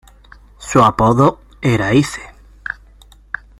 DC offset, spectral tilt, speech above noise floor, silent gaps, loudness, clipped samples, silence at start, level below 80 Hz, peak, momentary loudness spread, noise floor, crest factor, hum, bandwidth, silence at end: under 0.1%; -6 dB/octave; 31 dB; none; -14 LUFS; under 0.1%; 0.6 s; -40 dBFS; 0 dBFS; 19 LU; -44 dBFS; 16 dB; none; 15.5 kHz; 0.9 s